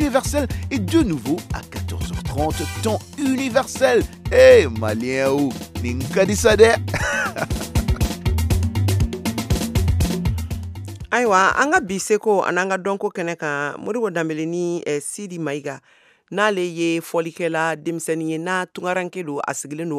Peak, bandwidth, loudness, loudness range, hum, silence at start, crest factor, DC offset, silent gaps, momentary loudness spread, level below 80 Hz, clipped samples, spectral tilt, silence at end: 0 dBFS; 16 kHz; -20 LUFS; 7 LU; none; 0 s; 20 dB; under 0.1%; none; 12 LU; -32 dBFS; under 0.1%; -5 dB/octave; 0 s